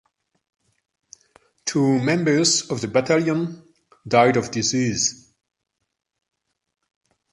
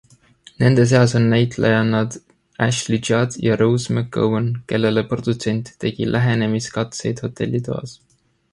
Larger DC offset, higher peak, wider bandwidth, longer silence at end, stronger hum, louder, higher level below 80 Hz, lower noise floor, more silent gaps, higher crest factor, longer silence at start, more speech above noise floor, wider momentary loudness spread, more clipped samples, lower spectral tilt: neither; about the same, -2 dBFS vs -2 dBFS; about the same, 11.5 kHz vs 11.5 kHz; first, 2.15 s vs 0.6 s; neither; about the same, -20 LUFS vs -19 LUFS; second, -60 dBFS vs -50 dBFS; first, -58 dBFS vs -49 dBFS; neither; about the same, 22 dB vs 18 dB; first, 1.65 s vs 0.6 s; first, 39 dB vs 31 dB; about the same, 8 LU vs 10 LU; neither; second, -4 dB/octave vs -6 dB/octave